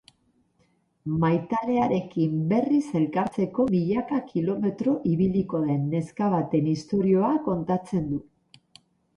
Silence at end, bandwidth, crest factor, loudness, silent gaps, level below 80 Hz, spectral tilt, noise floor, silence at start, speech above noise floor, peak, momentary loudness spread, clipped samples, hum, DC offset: 0.95 s; 10.5 kHz; 14 dB; -25 LUFS; none; -58 dBFS; -9 dB/octave; -67 dBFS; 1.05 s; 43 dB; -10 dBFS; 5 LU; under 0.1%; none; under 0.1%